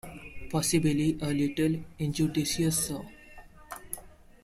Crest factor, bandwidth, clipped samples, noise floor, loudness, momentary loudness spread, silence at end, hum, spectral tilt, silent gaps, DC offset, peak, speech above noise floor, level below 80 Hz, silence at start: 16 dB; 16 kHz; under 0.1%; -50 dBFS; -29 LUFS; 19 LU; 0.35 s; none; -5 dB/octave; none; under 0.1%; -14 dBFS; 22 dB; -52 dBFS; 0.05 s